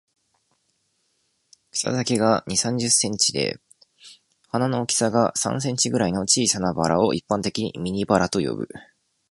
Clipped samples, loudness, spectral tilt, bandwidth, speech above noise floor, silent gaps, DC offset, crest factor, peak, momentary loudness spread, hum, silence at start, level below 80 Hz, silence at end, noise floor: under 0.1%; -22 LUFS; -3.5 dB/octave; 11.5 kHz; 48 dB; none; under 0.1%; 22 dB; -2 dBFS; 9 LU; none; 1.75 s; -54 dBFS; 0.5 s; -70 dBFS